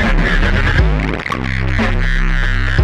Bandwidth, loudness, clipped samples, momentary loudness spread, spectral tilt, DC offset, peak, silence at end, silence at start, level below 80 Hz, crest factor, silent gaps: 8 kHz; -16 LUFS; under 0.1%; 5 LU; -6.5 dB/octave; under 0.1%; -2 dBFS; 0 s; 0 s; -16 dBFS; 10 dB; none